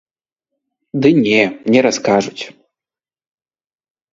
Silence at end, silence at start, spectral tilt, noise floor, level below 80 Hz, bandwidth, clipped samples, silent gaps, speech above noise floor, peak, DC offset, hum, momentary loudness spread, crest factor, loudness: 1.6 s; 0.95 s; -5 dB/octave; under -90 dBFS; -58 dBFS; 7.8 kHz; under 0.1%; none; over 76 dB; 0 dBFS; under 0.1%; none; 15 LU; 18 dB; -14 LUFS